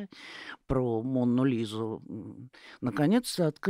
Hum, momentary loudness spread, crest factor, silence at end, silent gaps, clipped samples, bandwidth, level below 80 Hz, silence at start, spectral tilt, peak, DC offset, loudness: none; 17 LU; 16 dB; 0 s; none; under 0.1%; 16 kHz; -54 dBFS; 0 s; -6.5 dB/octave; -12 dBFS; under 0.1%; -29 LUFS